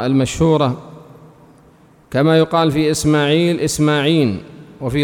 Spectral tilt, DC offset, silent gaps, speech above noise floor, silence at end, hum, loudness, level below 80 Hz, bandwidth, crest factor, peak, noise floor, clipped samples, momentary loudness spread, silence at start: -5.5 dB/octave; under 0.1%; none; 33 dB; 0 s; none; -15 LUFS; -42 dBFS; 18 kHz; 14 dB; -4 dBFS; -48 dBFS; under 0.1%; 9 LU; 0 s